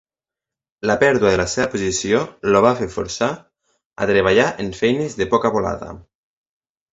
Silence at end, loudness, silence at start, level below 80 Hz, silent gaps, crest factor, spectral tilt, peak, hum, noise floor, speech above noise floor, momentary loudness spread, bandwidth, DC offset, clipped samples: 0.9 s; -18 LUFS; 0.85 s; -44 dBFS; 3.85-3.90 s; 20 dB; -4.5 dB/octave; 0 dBFS; none; -88 dBFS; 70 dB; 10 LU; 8 kHz; under 0.1%; under 0.1%